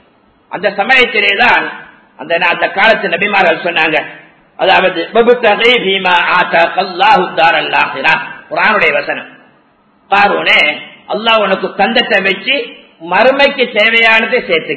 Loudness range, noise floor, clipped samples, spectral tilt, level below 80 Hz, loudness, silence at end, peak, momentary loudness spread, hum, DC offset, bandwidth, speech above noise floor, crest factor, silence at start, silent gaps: 2 LU; -50 dBFS; 0.3%; -4.5 dB/octave; -52 dBFS; -10 LUFS; 0 s; 0 dBFS; 9 LU; none; 0.2%; 8 kHz; 40 dB; 12 dB; 0.5 s; none